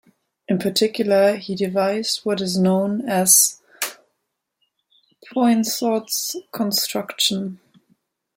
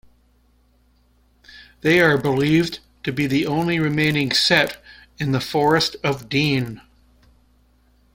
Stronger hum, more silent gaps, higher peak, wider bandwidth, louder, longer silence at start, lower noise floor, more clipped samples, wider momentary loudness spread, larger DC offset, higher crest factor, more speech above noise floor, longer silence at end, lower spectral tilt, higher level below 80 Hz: neither; neither; about the same, 0 dBFS vs -2 dBFS; about the same, 16.5 kHz vs 16.5 kHz; about the same, -19 LUFS vs -19 LUFS; second, 0.5 s vs 1.55 s; first, -77 dBFS vs -59 dBFS; neither; about the same, 14 LU vs 12 LU; neither; about the same, 22 dB vs 20 dB; first, 57 dB vs 40 dB; second, 0.8 s vs 1.35 s; second, -3 dB/octave vs -5 dB/octave; second, -66 dBFS vs -52 dBFS